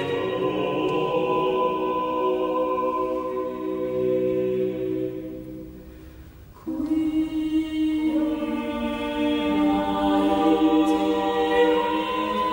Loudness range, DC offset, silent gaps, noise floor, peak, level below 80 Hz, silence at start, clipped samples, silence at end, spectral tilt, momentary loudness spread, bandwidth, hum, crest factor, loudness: 7 LU; under 0.1%; none; -44 dBFS; -8 dBFS; -48 dBFS; 0 s; under 0.1%; 0 s; -6.5 dB/octave; 9 LU; 16.5 kHz; none; 16 dB; -24 LUFS